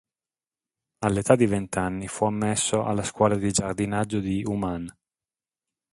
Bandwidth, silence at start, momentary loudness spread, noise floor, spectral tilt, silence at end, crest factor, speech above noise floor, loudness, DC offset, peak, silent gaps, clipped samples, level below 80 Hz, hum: 11.5 kHz; 1 s; 9 LU; under -90 dBFS; -5 dB/octave; 1 s; 24 dB; over 66 dB; -25 LUFS; under 0.1%; -2 dBFS; none; under 0.1%; -50 dBFS; none